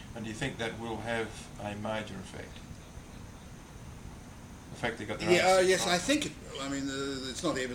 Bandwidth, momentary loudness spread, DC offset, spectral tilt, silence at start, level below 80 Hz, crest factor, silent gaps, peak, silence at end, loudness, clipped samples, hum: 17 kHz; 23 LU; under 0.1%; -4 dB/octave; 0 s; -54 dBFS; 22 dB; none; -12 dBFS; 0 s; -31 LUFS; under 0.1%; none